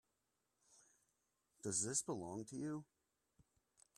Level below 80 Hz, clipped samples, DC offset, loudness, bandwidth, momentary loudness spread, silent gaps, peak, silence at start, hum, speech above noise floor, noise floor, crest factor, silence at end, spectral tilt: -84 dBFS; under 0.1%; under 0.1%; -44 LUFS; 14.5 kHz; 11 LU; none; -26 dBFS; 1.65 s; none; 43 dB; -87 dBFS; 24 dB; 1.15 s; -3.5 dB/octave